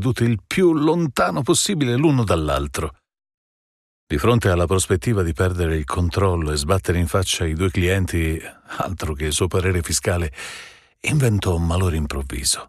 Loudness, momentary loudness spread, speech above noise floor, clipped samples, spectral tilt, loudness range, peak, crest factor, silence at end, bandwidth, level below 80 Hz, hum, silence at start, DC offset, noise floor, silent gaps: -20 LUFS; 9 LU; over 70 dB; under 0.1%; -5 dB/octave; 2 LU; -4 dBFS; 16 dB; 0.05 s; 14.5 kHz; -34 dBFS; none; 0 s; under 0.1%; under -90 dBFS; 3.34-4.07 s